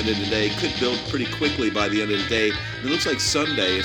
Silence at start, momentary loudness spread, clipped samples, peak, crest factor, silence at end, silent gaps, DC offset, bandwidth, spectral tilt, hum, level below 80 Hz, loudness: 0 s; 4 LU; under 0.1%; -4 dBFS; 18 dB; 0 s; none; under 0.1%; 18 kHz; -3.5 dB/octave; none; -44 dBFS; -22 LUFS